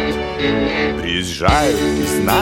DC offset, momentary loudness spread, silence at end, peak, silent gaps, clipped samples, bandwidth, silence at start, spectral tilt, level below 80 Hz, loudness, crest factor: under 0.1%; 5 LU; 0 s; 0 dBFS; none; under 0.1%; 17 kHz; 0 s; -4.5 dB/octave; -30 dBFS; -17 LUFS; 16 dB